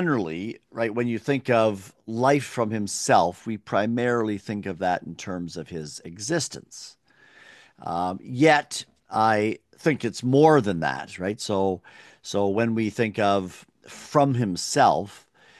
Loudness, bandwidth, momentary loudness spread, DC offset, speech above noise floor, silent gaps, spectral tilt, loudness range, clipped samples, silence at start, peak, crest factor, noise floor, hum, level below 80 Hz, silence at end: -24 LUFS; 12.5 kHz; 15 LU; under 0.1%; 30 dB; none; -5 dB/octave; 8 LU; under 0.1%; 0 s; -4 dBFS; 20 dB; -54 dBFS; none; -58 dBFS; 0.4 s